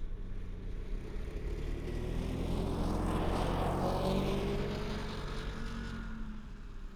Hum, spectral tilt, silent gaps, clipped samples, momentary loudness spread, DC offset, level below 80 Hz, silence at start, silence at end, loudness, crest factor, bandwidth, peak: none; -6.5 dB/octave; none; under 0.1%; 12 LU; under 0.1%; -40 dBFS; 0 s; 0 s; -38 LUFS; 16 dB; 15 kHz; -20 dBFS